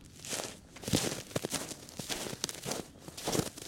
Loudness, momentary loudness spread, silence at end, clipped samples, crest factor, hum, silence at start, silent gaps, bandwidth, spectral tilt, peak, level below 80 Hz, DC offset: -36 LUFS; 10 LU; 0 s; under 0.1%; 30 dB; none; 0 s; none; 17 kHz; -3 dB/octave; -8 dBFS; -60 dBFS; under 0.1%